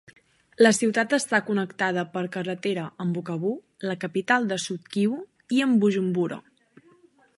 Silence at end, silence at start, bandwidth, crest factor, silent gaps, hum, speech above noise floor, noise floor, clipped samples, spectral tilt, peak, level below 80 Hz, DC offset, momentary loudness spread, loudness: 0.95 s; 0.6 s; 11.5 kHz; 20 dB; none; none; 34 dB; -58 dBFS; under 0.1%; -5 dB/octave; -4 dBFS; -76 dBFS; under 0.1%; 10 LU; -25 LUFS